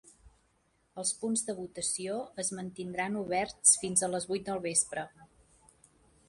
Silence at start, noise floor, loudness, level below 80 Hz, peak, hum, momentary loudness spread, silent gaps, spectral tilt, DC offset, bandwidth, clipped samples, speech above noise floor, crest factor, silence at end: 0.25 s; -72 dBFS; -30 LUFS; -68 dBFS; -10 dBFS; none; 14 LU; none; -2.5 dB/octave; under 0.1%; 11.5 kHz; under 0.1%; 40 dB; 24 dB; 1.05 s